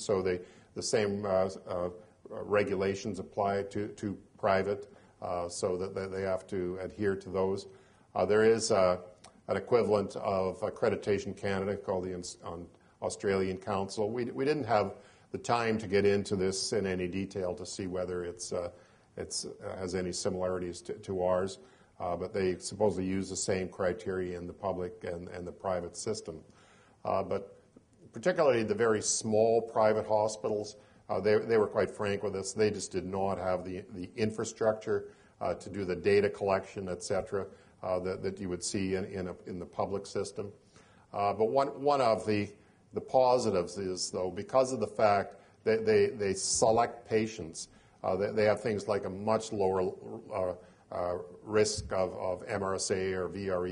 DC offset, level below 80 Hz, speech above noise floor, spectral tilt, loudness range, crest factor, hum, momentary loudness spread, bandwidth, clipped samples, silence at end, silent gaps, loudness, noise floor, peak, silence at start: under 0.1%; -64 dBFS; 29 dB; -4.5 dB/octave; 6 LU; 20 dB; none; 13 LU; 10.5 kHz; under 0.1%; 0 s; none; -32 LUFS; -61 dBFS; -12 dBFS; 0 s